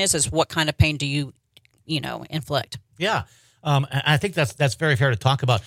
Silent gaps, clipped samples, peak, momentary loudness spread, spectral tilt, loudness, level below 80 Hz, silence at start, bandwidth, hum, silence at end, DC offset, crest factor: none; under 0.1%; -4 dBFS; 10 LU; -4 dB/octave; -22 LUFS; -44 dBFS; 0 s; 16 kHz; none; 0 s; under 0.1%; 20 dB